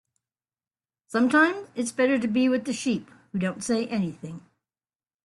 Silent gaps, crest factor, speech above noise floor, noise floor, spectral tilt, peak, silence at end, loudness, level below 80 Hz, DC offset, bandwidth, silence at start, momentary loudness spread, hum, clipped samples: none; 18 dB; over 65 dB; under -90 dBFS; -5 dB/octave; -8 dBFS; 0.85 s; -25 LUFS; -68 dBFS; under 0.1%; 12 kHz; 1.1 s; 13 LU; none; under 0.1%